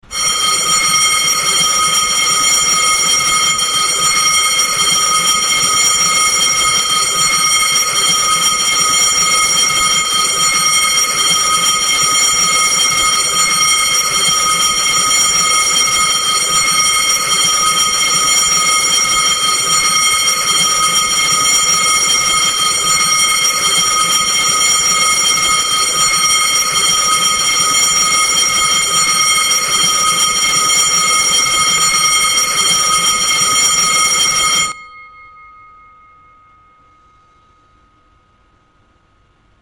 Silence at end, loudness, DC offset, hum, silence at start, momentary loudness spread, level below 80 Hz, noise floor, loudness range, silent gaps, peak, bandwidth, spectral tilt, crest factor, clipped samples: 4.35 s; -10 LUFS; under 0.1%; none; 0.1 s; 1 LU; -46 dBFS; -53 dBFS; 0 LU; none; 0 dBFS; 16.5 kHz; 1.5 dB/octave; 14 dB; under 0.1%